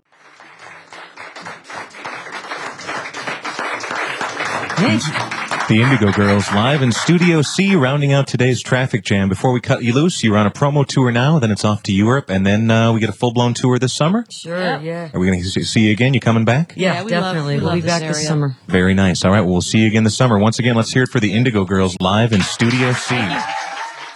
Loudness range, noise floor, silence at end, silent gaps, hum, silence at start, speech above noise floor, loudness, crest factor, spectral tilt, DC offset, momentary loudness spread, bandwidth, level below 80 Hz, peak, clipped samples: 6 LU; -45 dBFS; 0 s; none; none; 0.4 s; 30 dB; -16 LUFS; 14 dB; -5.5 dB/octave; under 0.1%; 12 LU; 12 kHz; -52 dBFS; -2 dBFS; under 0.1%